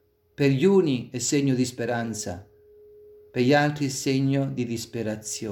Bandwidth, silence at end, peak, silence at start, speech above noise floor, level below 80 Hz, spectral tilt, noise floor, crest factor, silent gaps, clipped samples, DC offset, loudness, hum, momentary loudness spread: 17 kHz; 0 s; -8 dBFS; 0.4 s; 28 dB; -62 dBFS; -5.5 dB/octave; -52 dBFS; 18 dB; none; under 0.1%; under 0.1%; -25 LUFS; none; 11 LU